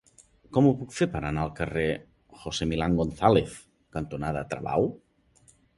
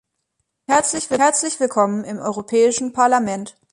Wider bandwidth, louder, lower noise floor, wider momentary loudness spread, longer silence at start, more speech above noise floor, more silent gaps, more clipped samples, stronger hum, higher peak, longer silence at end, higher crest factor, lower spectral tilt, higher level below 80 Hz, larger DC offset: about the same, 11.5 kHz vs 11.5 kHz; second, -27 LUFS vs -18 LUFS; second, -61 dBFS vs -74 dBFS; first, 14 LU vs 9 LU; second, 0.5 s vs 0.7 s; second, 35 dB vs 56 dB; neither; neither; neither; about the same, -4 dBFS vs -2 dBFS; first, 0.8 s vs 0.25 s; first, 22 dB vs 16 dB; first, -6.5 dB/octave vs -3 dB/octave; first, -46 dBFS vs -60 dBFS; neither